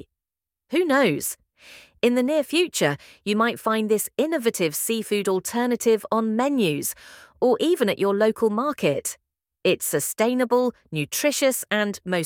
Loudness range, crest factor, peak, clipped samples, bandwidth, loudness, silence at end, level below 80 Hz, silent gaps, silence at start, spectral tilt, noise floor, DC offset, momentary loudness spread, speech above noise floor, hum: 1 LU; 18 dB; -4 dBFS; under 0.1%; 18 kHz; -23 LUFS; 0 s; -68 dBFS; none; 0.7 s; -4 dB/octave; -89 dBFS; under 0.1%; 7 LU; 67 dB; none